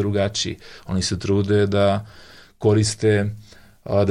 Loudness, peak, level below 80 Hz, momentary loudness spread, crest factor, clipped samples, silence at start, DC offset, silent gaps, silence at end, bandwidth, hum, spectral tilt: -21 LUFS; -6 dBFS; -48 dBFS; 10 LU; 14 dB; under 0.1%; 0 s; under 0.1%; none; 0 s; 11.5 kHz; none; -5.5 dB/octave